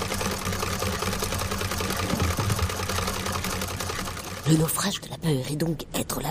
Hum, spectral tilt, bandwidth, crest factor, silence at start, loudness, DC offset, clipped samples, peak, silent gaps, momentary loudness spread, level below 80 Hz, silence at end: none; -4 dB/octave; 15.5 kHz; 20 dB; 0 s; -27 LUFS; under 0.1%; under 0.1%; -6 dBFS; none; 5 LU; -40 dBFS; 0 s